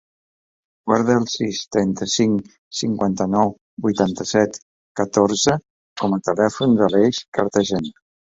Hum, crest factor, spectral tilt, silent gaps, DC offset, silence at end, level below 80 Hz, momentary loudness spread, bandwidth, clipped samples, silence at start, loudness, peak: none; 18 dB; -5 dB/octave; 2.58-2.71 s, 3.61-3.77 s, 4.62-4.95 s, 5.70-5.96 s, 7.28-7.32 s; under 0.1%; 0.45 s; -54 dBFS; 9 LU; 7.8 kHz; under 0.1%; 0.85 s; -20 LUFS; -2 dBFS